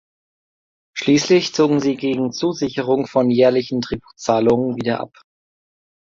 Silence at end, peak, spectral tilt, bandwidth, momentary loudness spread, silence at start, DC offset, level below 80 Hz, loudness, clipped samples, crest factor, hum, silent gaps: 0.95 s; -2 dBFS; -5.5 dB/octave; 7.6 kHz; 10 LU; 0.95 s; under 0.1%; -52 dBFS; -18 LUFS; under 0.1%; 16 dB; none; none